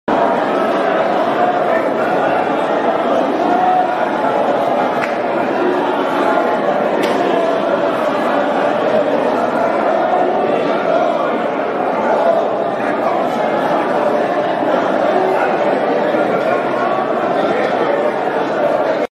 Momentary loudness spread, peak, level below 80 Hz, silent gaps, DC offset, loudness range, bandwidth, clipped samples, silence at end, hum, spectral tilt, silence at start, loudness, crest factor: 2 LU; 0 dBFS; -58 dBFS; none; under 0.1%; 1 LU; 13.5 kHz; under 0.1%; 0.05 s; none; -6 dB/octave; 0.05 s; -15 LUFS; 14 dB